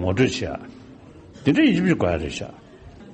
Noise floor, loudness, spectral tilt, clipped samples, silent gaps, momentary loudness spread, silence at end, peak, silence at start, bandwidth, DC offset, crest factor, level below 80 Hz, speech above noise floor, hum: -44 dBFS; -21 LUFS; -6 dB/octave; under 0.1%; none; 18 LU; 0 s; -6 dBFS; 0 s; 8.4 kHz; under 0.1%; 18 dB; -44 dBFS; 24 dB; none